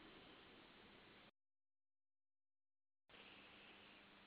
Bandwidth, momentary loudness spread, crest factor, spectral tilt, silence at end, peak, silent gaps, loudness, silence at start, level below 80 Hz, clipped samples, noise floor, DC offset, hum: 4.9 kHz; 4 LU; 18 dB; -1.5 dB/octave; 0 s; -50 dBFS; none; -64 LUFS; 0 s; -86 dBFS; under 0.1%; under -90 dBFS; under 0.1%; none